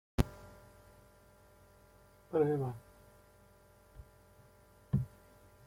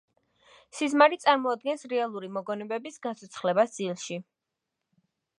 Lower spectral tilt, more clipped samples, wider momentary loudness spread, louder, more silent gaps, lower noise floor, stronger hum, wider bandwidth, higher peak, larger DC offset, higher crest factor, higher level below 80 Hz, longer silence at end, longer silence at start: first, -8 dB/octave vs -4 dB/octave; neither; first, 28 LU vs 15 LU; second, -36 LUFS vs -27 LUFS; neither; second, -63 dBFS vs -85 dBFS; neither; first, 16.5 kHz vs 11.5 kHz; second, -12 dBFS vs -6 dBFS; neither; about the same, 28 dB vs 24 dB; first, -52 dBFS vs -84 dBFS; second, 0.6 s vs 1.15 s; second, 0.2 s vs 0.75 s